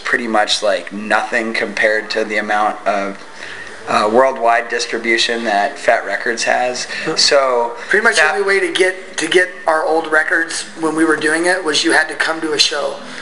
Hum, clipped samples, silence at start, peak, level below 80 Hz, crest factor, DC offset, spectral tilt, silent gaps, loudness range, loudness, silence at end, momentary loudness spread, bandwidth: none; under 0.1%; 0 s; 0 dBFS; -62 dBFS; 16 dB; 1%; -2 dB/octave; none; 3 LU; -15 LUFS; 0 s; 8 LU; 12 kHz